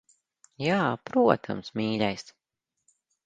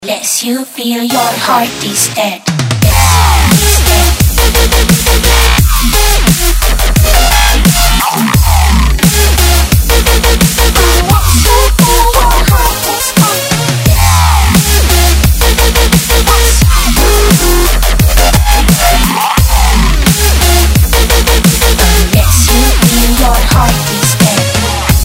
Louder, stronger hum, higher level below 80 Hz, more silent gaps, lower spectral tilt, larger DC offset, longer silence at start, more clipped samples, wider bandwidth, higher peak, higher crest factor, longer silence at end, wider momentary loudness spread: second, -27 LUFS vs -8 LUFS; neither; second, -66 dBFS vs -10 dBFS; neither; first, -6.5 dB/octave vs -3.5 dB/octave; neither; first, 0.6 s vs 0 s; second, under 0.1% vs 0.9%; second, 9.2 kHz vs 16.5 kHz; second, -4 dBFS vs 0 dBFS; first, 24 dB vs 8 dB; first, 1.05 s vs 0 s; first, 11 LU vs 4 LU